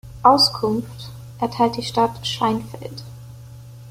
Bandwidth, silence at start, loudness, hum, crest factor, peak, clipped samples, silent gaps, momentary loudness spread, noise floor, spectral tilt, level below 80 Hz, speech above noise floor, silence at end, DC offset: 16.5 kHz; 0.05 s; -19 LUFS; none; 20 dB; -2 dBFS; under 0.1%; none; 25 LU; -39 dBFS; -5 dB/octave; -50 dBFS; 19 dB; 0 s; under 0.1%